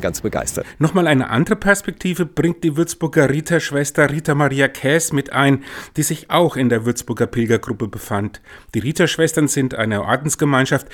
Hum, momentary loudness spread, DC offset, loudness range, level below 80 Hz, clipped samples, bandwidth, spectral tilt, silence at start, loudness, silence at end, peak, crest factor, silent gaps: none; 8 LU; under 0.1%; 2 LU; -44 dBFS; under 0.1%; 18.5 kHz; -5 dB/octave; 0 s; -18 LUFS; 0 s; 0 dBFS; 18 dB; none